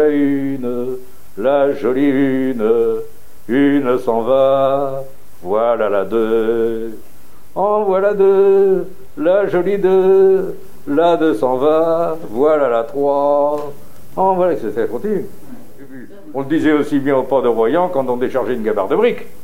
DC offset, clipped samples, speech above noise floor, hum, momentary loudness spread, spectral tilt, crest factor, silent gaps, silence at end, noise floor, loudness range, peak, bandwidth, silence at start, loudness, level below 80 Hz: 5%; under 0.1%; 21 dB; none; 13 LU; -7.5 dB/octave; 14 dB; none; 0.15 s; -36 dBFS; 5 LU; -2 dBFS; 16 kHz; 0 s; -16 LUFS; -54 dBFS